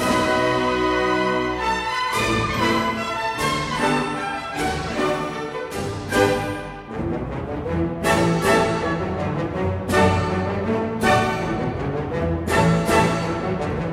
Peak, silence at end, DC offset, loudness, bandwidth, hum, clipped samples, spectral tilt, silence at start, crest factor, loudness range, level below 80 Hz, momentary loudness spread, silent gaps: -6 dBFS; 0 s; under 0.1%; -22 LUFS; 16 kHz; none; under 0.1%; -5.5 dB/octave; 0 s; 16 dB; 3 LU; -40 dBFS; 9 LU; none